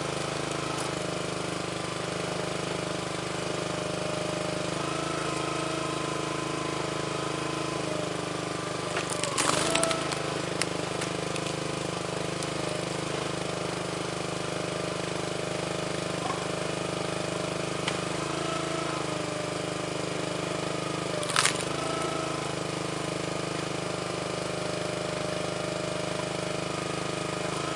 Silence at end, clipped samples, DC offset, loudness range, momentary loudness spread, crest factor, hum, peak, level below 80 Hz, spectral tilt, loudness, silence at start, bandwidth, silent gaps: 0 s; under 0.1%; under 0.1%; 3 LU; 3 LU; 28 dB; none; -2 dBFS; -56 dBFS; -3.5 dB/octave; -30 LUFS; 0 s; 11.5 kHz; none